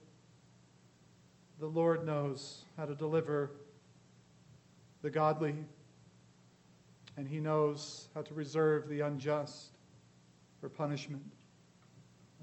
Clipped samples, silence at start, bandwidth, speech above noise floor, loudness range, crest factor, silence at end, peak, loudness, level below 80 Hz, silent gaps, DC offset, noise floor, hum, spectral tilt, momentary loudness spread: under 0.1%; 1.55 s; 8.4 kHz; 29 dB; 4 LU; 20 dB; 0 s; -18 dBFS; -36 LUFS; -82 dBFS; none; under 0.1%; -64 dBFS; 60 Hz at -65 dBFS; -6.5 dB/octave; 17 LU